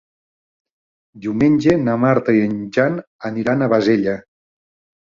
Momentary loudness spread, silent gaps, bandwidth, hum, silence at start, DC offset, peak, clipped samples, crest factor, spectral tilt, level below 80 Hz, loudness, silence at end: 12 LU; 3.07-3.19 s; 7.4 kHz; none; 1.15 s; under 0.1%; 0 dBFS; under 0.1%; 18 dB; -8 dB/octave; -52 dBFS; -17 LUFS; 0.95 s